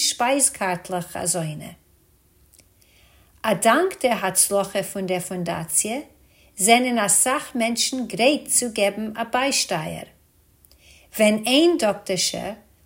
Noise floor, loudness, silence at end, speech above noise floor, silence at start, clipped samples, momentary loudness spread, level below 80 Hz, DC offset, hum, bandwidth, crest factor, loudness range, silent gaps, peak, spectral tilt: -58 dBFS; -21 LUFS; 0.3 s; 37 dB; 0 s; under 0.1%; 12 LU; -60 dBFS; under 0.1%; none; 16.5 kHz; 20 dB; 5 LU; none; -2 dBFS; -2.5 dB/octave